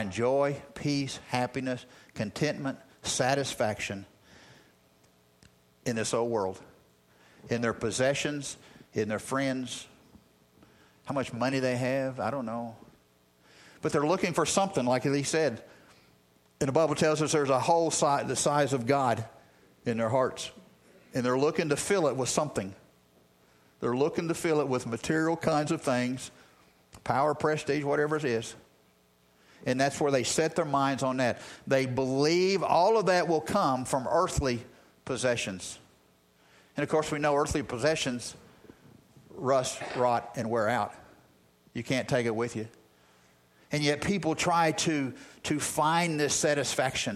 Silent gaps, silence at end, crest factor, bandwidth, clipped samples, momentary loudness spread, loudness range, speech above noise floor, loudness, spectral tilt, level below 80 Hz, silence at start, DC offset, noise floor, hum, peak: none; 0 s; 20 dB; 15 kHz; under 0.1%; 12 LU; 7 LU; 36 dB; -29 LUFS; -4.5 dB/octave; -58 dBFS; 0 s; under 0.1%; -65 dBFS; none; -10 dBFS